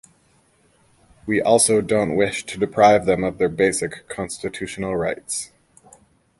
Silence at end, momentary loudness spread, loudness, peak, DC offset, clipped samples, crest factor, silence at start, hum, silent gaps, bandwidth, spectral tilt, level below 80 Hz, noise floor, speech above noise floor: 0.95 s; 14 LU; -20 LUFS; -2 dBFS; under 0.1%; under 0.1%; 20 dB; 1.25 s; none; none; 12 kHz; -4 dB/octave; -50 dBFS; -60 dBFS; 40 dB